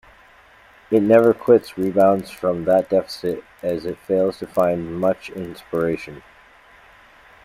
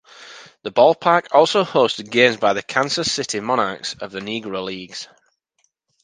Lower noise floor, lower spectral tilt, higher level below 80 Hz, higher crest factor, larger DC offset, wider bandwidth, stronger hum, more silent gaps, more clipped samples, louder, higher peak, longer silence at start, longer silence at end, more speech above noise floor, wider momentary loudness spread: second, -50 dBFS vs -68 dBFS; first, -7.5 dB/octave vs -3.5 dB/octave; first, -56 dBFS vs -62 dBFS; about the same, 20 dB vs 20 dB; neither; first, 16 kHz vs 10 kHz; neither; neither; neither; about the same, -20 LUFS vs -18 LUFS; about the same, -2 dBFS vs 0 dBFS; first, 0.9 s vs 0.2 s; first, 1.25 s vs 1 s; second, 31 dB vs 49 dB; second, 13 LU vs 18 LU